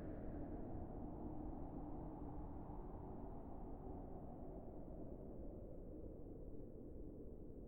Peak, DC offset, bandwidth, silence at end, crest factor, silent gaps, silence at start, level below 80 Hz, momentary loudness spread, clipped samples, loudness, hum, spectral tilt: -38 dBFS; under 0.1%; 16.5 kHz; 0 s; 14 dB; none; 0 s; -56 dBFS; 5 LU; under 0.1%; -54 LUFS; none; -11 dB/octave